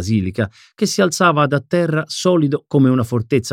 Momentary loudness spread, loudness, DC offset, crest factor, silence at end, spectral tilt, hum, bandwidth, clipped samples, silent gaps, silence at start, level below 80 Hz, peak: 8 LU; -17 LUFS; under 0.1%; 14 dB; 0 s; -5.5 dB/octave; none; 16 kHz; under 0.1%; none; 0 s; -52 dBFS; -2 dBFS